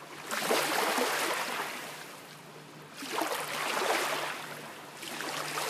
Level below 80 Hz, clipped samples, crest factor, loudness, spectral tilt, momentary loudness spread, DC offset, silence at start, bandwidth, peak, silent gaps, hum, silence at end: -82 dBFS; under 0.1%; 20 dB; -32 LUFS; -1.5 dB/octave; 18 LU; under 0.1%; 0 s; 15.5 kHz; -14 dBFS; none; none; 0 s